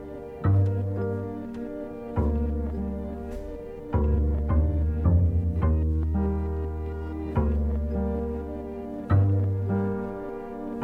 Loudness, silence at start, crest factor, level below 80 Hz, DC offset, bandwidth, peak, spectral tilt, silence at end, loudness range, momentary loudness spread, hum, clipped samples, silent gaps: -27 LUFS; 0 s; 16 dB; -30 dBFS; under 0.1%; 3.2 kHz; -10 dBFS; -11 dB/octave; 0 s; 4 LU; 12 LU; none; under 0.1%; none